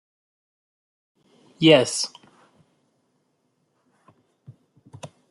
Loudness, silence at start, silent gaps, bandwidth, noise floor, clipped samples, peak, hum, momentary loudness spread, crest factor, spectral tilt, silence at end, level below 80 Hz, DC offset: -19 LUFS; 1.6 s; none; 12 kHz; -71 dBFS; under 0.1%; -2 dBFS; none; 28 LU; 24 dB; -4 dB/octave; 0.25 s; -70 dBFS; under 0.1%